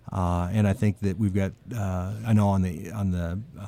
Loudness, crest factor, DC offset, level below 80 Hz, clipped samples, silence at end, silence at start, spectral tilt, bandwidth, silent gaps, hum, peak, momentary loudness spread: -26 LUFS; 14 dB; under 0.1%; -46 dBFS; under 0.1%; 0 s; 0.1 s; -8 dB/octave; 15 kHz; none; none; -12 dBFS; 8 LU